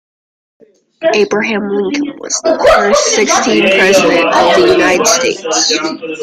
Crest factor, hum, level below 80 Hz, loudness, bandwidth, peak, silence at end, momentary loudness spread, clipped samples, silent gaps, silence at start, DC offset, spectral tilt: 12 dB; none; -42 dBFS; -10 LUFS; 16 kHz; 0 dBFS; 0 s; 7 LU; under 0.1%; none; 1 s; under 0.1%; -2 dB/octave